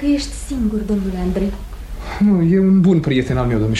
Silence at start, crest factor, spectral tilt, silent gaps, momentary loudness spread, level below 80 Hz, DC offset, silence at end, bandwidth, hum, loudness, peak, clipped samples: 0 s; 12 dB; -7 dB/octave; none; 15 LU; -30 dBFS; under 0.1%; 0 s; 12.5 kHz; none; -17 LUFS; -4 dBFS; under 0.1%